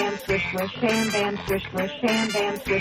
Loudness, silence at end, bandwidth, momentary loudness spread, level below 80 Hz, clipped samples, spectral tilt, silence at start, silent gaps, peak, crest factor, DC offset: -24 LUFS; 0 s; 16 kHz; 5 LU; -48 dBFS; under 0.1%; -4 dB/octave; 0 s; none; -10 dBFS; 14 dB; under 0.1%